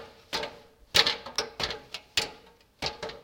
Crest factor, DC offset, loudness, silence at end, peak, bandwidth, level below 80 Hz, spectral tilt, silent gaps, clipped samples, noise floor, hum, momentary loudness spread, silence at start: 30 dB; under 0.1%; -29 LUFS; 0 s; -2 dBFS; 17 kHz; -56 dBFS; -1 dB/octave; none; under 0.1%; -55 dBFS; none; 14 LU; 0 s